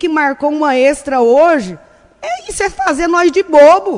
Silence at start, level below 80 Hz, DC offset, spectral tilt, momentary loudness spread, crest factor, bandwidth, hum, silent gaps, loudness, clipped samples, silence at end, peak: 0 s; -42 dBFS; under 0.1%; -4 dB/octave; 15 LU; 12 dB; 11 kHz; none; none; -11 LUFS; 0.2%; 0 s; 0 dBFS